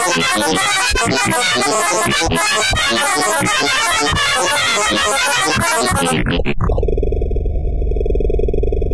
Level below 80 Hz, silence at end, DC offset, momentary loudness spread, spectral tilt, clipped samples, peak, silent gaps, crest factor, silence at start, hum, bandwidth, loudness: -22 dBFS; 0 s; 1%; 6 LU; -2.5 dB/octave; under 0.1%; -4 dBFS; none; 10 dB; 0 s; none; 11 kHz; -15 LUFS